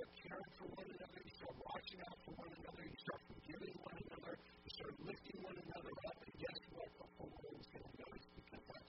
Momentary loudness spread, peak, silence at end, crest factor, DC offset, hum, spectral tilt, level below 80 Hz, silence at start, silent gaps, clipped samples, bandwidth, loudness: 6 LU; -34 dBFS; 0 s; 20 dB; under 0.1%; none; -3.5 dB/octave; -70 dBFS; 0 s; none; under 0.1%; 5.6 kHz; -55 LUFS